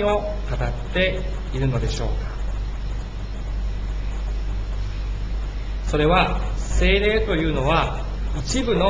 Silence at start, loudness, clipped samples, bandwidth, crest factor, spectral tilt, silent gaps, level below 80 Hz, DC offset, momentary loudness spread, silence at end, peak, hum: 0 s; -24 LUFS; under 0.1%; 8 kHz; 18 dB; -5.5 dB/octave; none; -26 dBFS; under 0.1%; 11 LU; 0 s; -4 dBFS; none